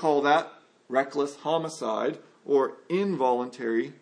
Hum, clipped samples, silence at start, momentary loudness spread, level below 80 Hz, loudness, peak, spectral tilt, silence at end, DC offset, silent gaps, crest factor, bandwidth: none; under 0.1%; 0 s; 7 LU; -86 dBFS; -27 LUFS; -8 dBFS; -5.5 dB/octave; 0.1 s; under 0.1%; none; 18 dB; 10.5 kHz